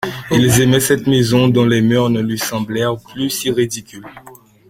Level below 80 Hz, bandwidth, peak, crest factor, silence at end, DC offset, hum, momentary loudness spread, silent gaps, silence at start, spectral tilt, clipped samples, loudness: -44 dBFS; 16.5 kHz; 0 dBFS; 14 dB; 0.4 s; under 0.1%; none; 9 LU; none; 0 s; -5 dB/octave; under 0.1%; -15 LUFS